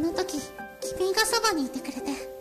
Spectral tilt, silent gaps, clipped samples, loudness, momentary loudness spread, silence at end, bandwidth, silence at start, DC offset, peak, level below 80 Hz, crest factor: -2 dB/octave; none; under 0.1%; -27 LUFS; 12 LU; 0 s; 14 kHz; 0 s; under 0.1%; -12 dBFS; -56 dBFS; 18 dB